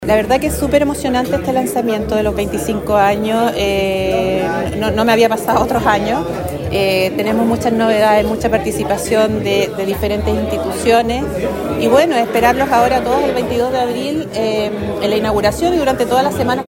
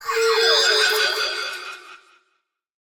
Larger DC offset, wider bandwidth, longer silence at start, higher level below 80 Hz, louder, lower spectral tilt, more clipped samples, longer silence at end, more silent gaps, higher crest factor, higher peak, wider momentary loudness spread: neither; second, 16.5 kHz vs over 20 kHz; about the same, 0 s vs 0 s; first, -32 dBFS vs -66 dBFS; first, -15 LUFS vs -18 LUFS; first, -5 dB/octave vs 1.5 dB/octave; neither; second, 0.05 s vs 1 s; neither; about the same, 14 dB vs 16 dB; first, 0 dBFS vs -6 dBFS; second, 6 LU vs 18 LU